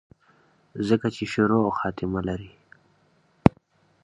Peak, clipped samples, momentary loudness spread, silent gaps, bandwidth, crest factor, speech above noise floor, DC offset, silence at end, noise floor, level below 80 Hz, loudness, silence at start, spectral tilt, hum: 0 dBFS; under 0.1%; 10 LU; none; 11 kHz; 26 dB; 39 dB; under 0.1%; 0.55 s; -63 dBFS; -48 dBFS; -25 LUFS; 0.75 s; -7.5 dB/octave; none